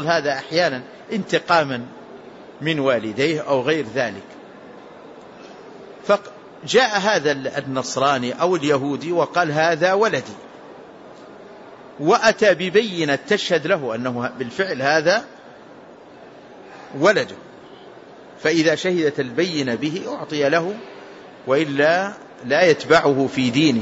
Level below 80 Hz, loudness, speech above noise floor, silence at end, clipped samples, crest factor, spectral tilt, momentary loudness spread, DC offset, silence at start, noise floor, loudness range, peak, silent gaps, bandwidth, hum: -64 dBFS; -19 LUFS; 23 dB; 0 s; under 0.1%; 18 dB; -4.5 dB/octave; 24 LU; under 0.1%; 0 s; -43 dBFS; 5 LU; -4 dBFS; none; 8 kHz; none